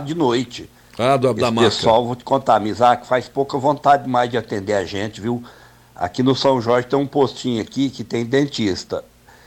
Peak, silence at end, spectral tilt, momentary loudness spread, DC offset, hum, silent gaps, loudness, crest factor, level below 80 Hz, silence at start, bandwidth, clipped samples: -4 dBFS; 0.45 s; -5.5 dB/octave; 10 LU; under 0.1%; none; none; -19 LUFS; 16 dB; -52 dBFS; 0 s; 16 kHz; under 0.1%